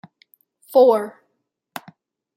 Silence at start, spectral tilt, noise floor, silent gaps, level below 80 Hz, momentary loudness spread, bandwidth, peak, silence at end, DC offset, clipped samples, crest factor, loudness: 0.7 s; -5.5 dB/octave; -74 dBFS; none; -82 dBFS; 23 LU; 16 kHz; -4 dBFS; 1.25 s; under 0.1%; under 0.1%; 18 dB; -17 LUFS